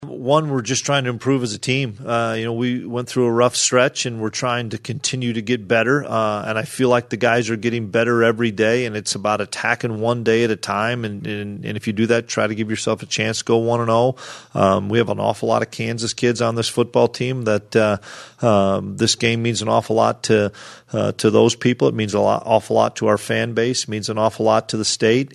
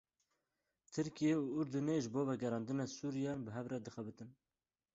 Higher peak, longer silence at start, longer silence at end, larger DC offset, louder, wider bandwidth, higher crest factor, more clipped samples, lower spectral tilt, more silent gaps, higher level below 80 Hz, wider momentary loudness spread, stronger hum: first, 0 dBFS vs -26 dBFS; second, 0 s vs 0.9 s; second, 0 s vs 0.65 s; neither; first, -19 LUFS vs -40 LUFS; first, 13 kHz vs 8 kHz; about the same, 18 dB vs 16 dB; neither; second, -4.5 dB/octave vs -7 dB/octave; neither; first, -60 dBFS vs -76 dBFS; second, 7 LU vs 13 LU; neither